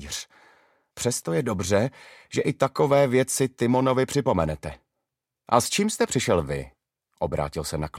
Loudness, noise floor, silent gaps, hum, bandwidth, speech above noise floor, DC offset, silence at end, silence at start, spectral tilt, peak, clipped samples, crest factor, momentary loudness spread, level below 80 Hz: -24 LUFS; -84 dBFS; none; none; 16.5 kHz; 60 dB; under 0.1%; 0 s; 0 s; -5 dB/octave; -4 dBFS; under 0.1%; 20 dB; 12 LU; -48 dBFS